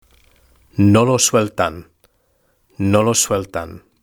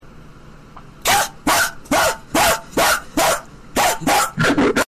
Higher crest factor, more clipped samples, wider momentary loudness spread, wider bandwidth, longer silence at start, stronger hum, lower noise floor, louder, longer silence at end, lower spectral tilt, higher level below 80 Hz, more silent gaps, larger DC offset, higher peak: about the same, 18 dB vs 14 dB; neither; first, 16 LU vs 3 LU; first, over 20 kHz vs 15 kHz; first, 0.75 s vs 0.05 s; neither; first, -62 dBFS vs -40 dBFS; about the same, -16 LUFS vs -17 LUFS; first, 0.25 s vs 0.05 s; first, -4.5 dB/octave vs -2.5 dB/octave; second, -48 dBFS vs -40 dBFS; neither; neither; first, 0 dBFS vs -6 dBFS